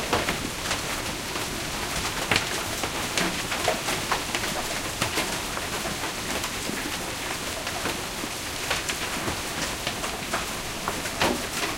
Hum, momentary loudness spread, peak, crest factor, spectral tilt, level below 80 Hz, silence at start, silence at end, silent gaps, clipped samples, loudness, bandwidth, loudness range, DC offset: none; 4 LU; -4 dBFS; 24 dB; -2 dB/octave; -44 dBFS; 0 s; 0 s; none; under 0.1%; -27 LUFS; 17 kHz; 3 LU; under 0.1%